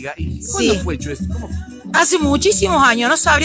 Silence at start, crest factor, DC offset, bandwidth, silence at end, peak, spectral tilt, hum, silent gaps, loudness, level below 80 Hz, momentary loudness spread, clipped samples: 0 s; 16 dB; under 0.1%; 8 kHz; 0 s; -2 dBFS; -3.5 dB/octave; none; none; -16 LUFS; -30 dBFS; 13 LU; under 0.1%